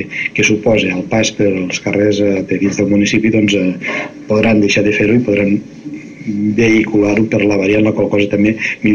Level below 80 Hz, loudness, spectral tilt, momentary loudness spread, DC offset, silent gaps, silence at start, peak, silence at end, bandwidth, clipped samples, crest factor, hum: -44 dBFS; -13 LUFS; -5.5 dB/octave; 8 LU; under 0.1%; none; 0 s; -2 dBFS; 0 s; 7.4 kHz; under 0.1%; 10 dB; none